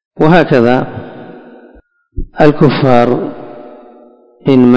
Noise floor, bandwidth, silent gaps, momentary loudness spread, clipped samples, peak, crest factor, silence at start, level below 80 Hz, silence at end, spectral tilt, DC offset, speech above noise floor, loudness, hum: -44 dBFS; 8 kHz; none; 23 LU; 2%; 0 dBFS; 12 dB; 0.15 s; -34 dBFS; 0 s; -8.5 dB/octave; under 0.1%; 36 dB; -10 LUFS; none